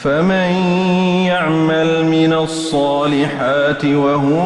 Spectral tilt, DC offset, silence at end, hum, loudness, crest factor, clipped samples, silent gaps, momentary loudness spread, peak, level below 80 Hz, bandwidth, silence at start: -6.5 dB/octave; under 0.1%; 0 s; none; -15 LUFS; 10 dB; under 0.1%; none; 2 LU; -4 dBFS; -50 dBFS; 11.5 kHz; 0 s